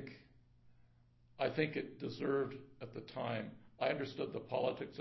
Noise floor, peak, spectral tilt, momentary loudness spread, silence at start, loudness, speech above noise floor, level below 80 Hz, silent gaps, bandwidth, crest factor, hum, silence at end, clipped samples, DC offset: -68 dBFS; -20 dBFS; -4.5 dB/octave; 13 LU; 0 s; -40 LUFS; 28 dB; -74 dBFS; none; 6 kHz; 22 dB; none; 0 s; under 0.1%; under 0.1%